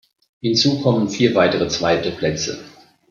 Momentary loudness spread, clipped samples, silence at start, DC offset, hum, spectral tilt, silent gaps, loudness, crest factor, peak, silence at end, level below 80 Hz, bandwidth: 10 LU; under 0.1%; 0.45 s; under 0.1%; none; -4.5 dB/octave; none; -18 LUFS; 16 dB; -2 dBFS; 0.4 s; -52 dBFS; 7.4 kHz